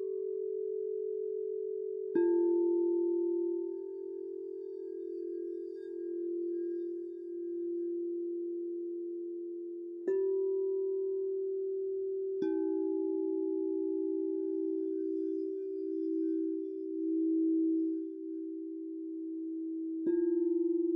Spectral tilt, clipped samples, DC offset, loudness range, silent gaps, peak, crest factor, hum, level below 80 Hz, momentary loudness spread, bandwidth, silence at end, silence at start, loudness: -8 dB/octave; under 0.1%; under 0.1%; 6 LU; none; -20 dBFS; 14 dB; none; -86 dBFS; 11 LU; 1.9 kHz; 0 s; 0 s; -35 LUFS